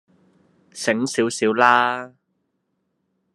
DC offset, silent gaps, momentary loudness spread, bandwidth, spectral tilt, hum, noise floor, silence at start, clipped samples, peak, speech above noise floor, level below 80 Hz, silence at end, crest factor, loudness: under 0.1%; none; 13 LU; 13 kHz; -3.5 dB/octave; none; -73 dBFS; 0.75 s; under 0.1%; 0 dBFS; 54 dB; -72 dBFS; 1.25 s; 22 dB; -19 LUFS